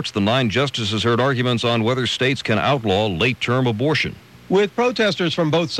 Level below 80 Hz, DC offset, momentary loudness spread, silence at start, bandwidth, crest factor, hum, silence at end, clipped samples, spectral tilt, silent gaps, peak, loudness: -52 dBFS; under 0.1%; 2 LU; 0 s; 12.5 kHz; 12 dB; none; 0 s; under 0.1%; -5.5 dB/octave; none; -6 dBFS; -19 LUFS